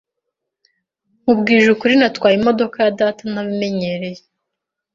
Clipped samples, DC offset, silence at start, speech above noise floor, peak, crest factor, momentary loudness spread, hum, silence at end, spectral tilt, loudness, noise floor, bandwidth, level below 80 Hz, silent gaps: under 0.1%; under 0.1%; 1.25 s; 65 dB; -2 dBFS; 16 dB; 11 LU; none; 0.75 s; -6 dB/octave; -16 LUFS; -80 dBFS; 7.6 kHz; -58 dBFS; none